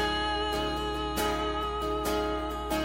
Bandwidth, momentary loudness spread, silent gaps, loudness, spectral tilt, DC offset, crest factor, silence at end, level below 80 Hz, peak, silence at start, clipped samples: 16.5 kHz; 3 LU; none; -30 LUFS; -4 dB/octave; under 0.1%; 14 dB; 0 s; -40 dBFS; -16 dBFS; 0 s; under 0.1%